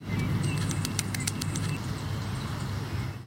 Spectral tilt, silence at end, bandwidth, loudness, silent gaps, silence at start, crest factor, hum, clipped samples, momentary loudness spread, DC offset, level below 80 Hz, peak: -4.5 dB/octave; 0 s; 17 kHz; -31 LUFS; none; 0 s; 26 dB; none; under 0.1%; 5 LU; under 0.1%; -46 dBFS; -4 dBFS